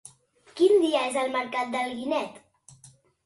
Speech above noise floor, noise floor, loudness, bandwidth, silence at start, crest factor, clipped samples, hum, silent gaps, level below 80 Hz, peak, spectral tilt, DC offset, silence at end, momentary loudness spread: 29 dB; -57 dBFS; -25 LUFS; 11.5 kHz; 0.55 s; 18 dB; under 0.1%; none; none; -74 dBFS; -10 dBFS; -3 dB/octave; under 0.1%; 0.9 s; 10 LU